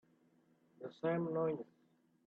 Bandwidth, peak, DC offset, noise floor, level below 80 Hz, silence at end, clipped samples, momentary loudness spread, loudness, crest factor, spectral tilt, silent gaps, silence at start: 6.2 kHz; -26 dBFS; under 0.1%; -73 dBFS; -86 dBFS; 0.65 s; under 0.1%; 16 LU; -39 LUFS; 16 dB; -9.5 dB/octave; none; 0.8 s